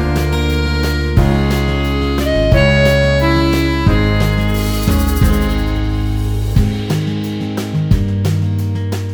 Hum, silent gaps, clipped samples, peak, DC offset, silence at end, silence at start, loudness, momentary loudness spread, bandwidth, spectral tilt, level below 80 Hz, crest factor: none; none; under 0.1%; 0 dBFS; under 0.1%; 0 s; 0 s; -15 LUFS; 7 LU; over 20 kHz; -6.5 dB/octave; -18 dBFS; 14 dB